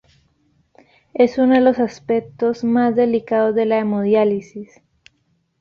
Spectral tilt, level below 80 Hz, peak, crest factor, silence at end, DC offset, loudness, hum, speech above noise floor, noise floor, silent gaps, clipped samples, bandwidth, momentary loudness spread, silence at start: -7.5 dB/octave; -58 dBFS; -2 dBFS; 16 dB; 0.95 s; under 0.1%; -17 LUFS; none; 48 dB; -65 dBFS; none; under 0.1%; 6.8 kHz; 9 LU; 1.2 s